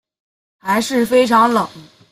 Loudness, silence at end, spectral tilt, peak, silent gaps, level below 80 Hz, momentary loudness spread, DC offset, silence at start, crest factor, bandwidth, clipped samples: -15 LUFS; 0.3 s; -4 dB/octave; -2 dBFS; none; -58 dBFS; 13 LU; under 0.1%; 0.65 s; 14 dB; 16 kHz; under 0.1%